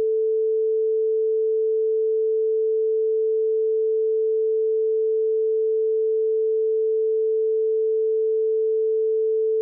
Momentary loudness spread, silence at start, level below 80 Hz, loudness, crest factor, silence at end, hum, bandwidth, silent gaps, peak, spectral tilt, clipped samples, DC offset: 0 LU; 0 s; under -90 dBFS; -22 LUFS; 4 dB; 0 s; 60 Hz at -120 dBFS; 0.5 kHz; none; -18 dBFS; -10.5 dB/octave; under 0.1%; under 0.1%